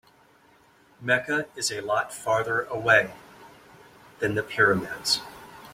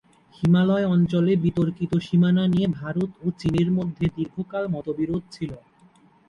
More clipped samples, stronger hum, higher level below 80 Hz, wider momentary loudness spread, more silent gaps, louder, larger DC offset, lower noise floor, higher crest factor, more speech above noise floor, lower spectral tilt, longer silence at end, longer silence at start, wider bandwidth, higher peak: neither; neither; second, -62 dBFS vs -50 dBFS; about the same, 11 LU vs 10 LU; neither; about the same, -25 LUFS vs -23 LUFS; neither; about the same, -58 dBFS vs -56 dBFS; first, 22 dB vs 14 dB; about the same, 33 dB vs 34 dB; second, -3 dB/octave vs -9 dB/octave; second, 0 s vs 0.7 s; first, 1 s vs 0.4 s; first, 16.5 kHz vs 7 kHz; first, -6 dBFS vs -10 dBFS